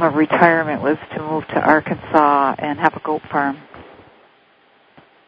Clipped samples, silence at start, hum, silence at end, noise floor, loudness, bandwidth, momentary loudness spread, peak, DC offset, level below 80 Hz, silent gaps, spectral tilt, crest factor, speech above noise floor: under 0.1%; 0 s; none; 1.45 s; -54 dBFS; -17 LUFS; 5.6 kHz; 10 LU; 0 dBFS; under 0.1%; -56 dBFS; none; -8.5 dB/octave; 18 dB; 37 dB